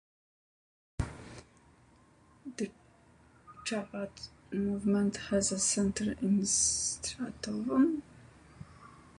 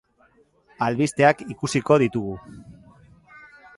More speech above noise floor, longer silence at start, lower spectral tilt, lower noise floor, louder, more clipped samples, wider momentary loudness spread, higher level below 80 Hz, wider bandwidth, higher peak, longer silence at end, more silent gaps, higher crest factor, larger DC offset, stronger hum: second, 31 dB vs 38 dB; first, 1 s vs 0.8 s; second, -4 dB/octave vs -6 dB/octave; about the same, -62 dBFS vs -60 dBFS; second, -32 LUFS vs -22 LUFS; neither; first, 22 LU vs 12 LU; about the same, -56 dBFS vs -56 dBFS; about the same, 11.5 kHz vs 11.5 kHz; second, -16 dBFS vs -4 dBFS; second, 0.25 s vs 0.4 s; neither; about the same, 18 dB vs 22 dB; neither; neither